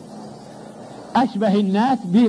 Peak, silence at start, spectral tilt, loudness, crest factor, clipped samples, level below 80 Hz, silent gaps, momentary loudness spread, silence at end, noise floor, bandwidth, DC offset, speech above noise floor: -6 dBFS; 0 s; -7.5 dB/octave; -19 LUFS; 14 dB; under 0.1%; -64 dBFS; none; 20 LU; 0 s; -38 dBFS; 10.5 kHz; under 0.1%; 21 dB